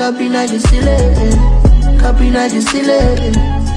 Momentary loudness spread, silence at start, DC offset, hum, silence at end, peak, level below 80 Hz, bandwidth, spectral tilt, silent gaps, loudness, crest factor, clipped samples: 4 LU; 0 s; under 0.1%; none; 0 s; 0 dBFS; -12 dBFS; 10.5 kHz; -6 dB/octave; none; -12 LUFS; 10 dB; under 0.1%